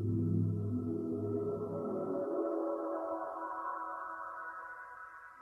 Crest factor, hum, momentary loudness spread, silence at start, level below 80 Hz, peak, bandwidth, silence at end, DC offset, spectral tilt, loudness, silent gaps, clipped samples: 16 dB; none; 12 LU; 0 s; -64 dBFS; -22 dBFS; 2.5 kHz; 0 s; under 0.1%; -11 dB/octave; -38 LUFS; none; under 0.1%